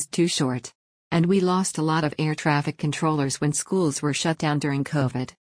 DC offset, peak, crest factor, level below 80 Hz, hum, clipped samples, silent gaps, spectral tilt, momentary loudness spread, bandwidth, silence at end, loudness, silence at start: under 0.1%; -8 dBFS; 16 dB; -60 dBFS; none; under 0.1%; 0.75-1.11 s; -5 dB/octave; 6 LU; 10.5 kHz; 0.15 s; -24 LUFS; 0 s